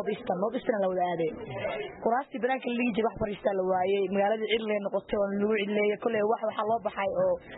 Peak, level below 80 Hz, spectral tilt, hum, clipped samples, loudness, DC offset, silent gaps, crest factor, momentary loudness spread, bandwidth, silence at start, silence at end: -14 dBFS; -60 dBFS; -10 dB/octave; none; under 0.1%; -29 LUFS; under 0.1%; none; 14 dB; 5 LU; 4 kHz; 0 s; 0 s